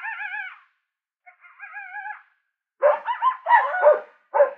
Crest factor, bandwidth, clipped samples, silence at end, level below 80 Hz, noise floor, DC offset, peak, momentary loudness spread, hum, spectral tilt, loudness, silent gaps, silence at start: 20 dB; 4.1 kHz; under 0.1%; 0 s; under -90 dBFS; -80 dBFS; under 0.1%; -4 dBFS; 19 LU; none; -2 dB/octave; -21 LUFS; none; 0 s